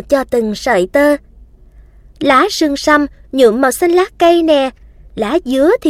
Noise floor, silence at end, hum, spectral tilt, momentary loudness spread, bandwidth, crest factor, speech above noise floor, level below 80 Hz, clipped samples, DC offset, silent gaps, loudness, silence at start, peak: -41 dBFS; 0 s; none; -4 dB/octave; 8 LU; 16 kHz; 14 dB; 29 dB; -40 dBFS; under 0.1%; under 0.1%; none; -13 LUFS; 0.1 s; 0 dBFS